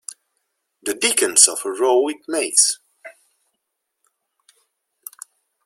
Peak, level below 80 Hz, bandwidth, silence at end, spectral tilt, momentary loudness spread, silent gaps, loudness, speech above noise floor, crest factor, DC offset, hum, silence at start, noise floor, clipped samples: 0 dBFS; -72 dBFS; 16.5 kHz; 2.55 s; 1 dB/octave; 24 LU; none; -16 LUFS; 59 dB; 22 dB; under 0.1%; none; 0.1 s; -77 dBFS; under 0.1%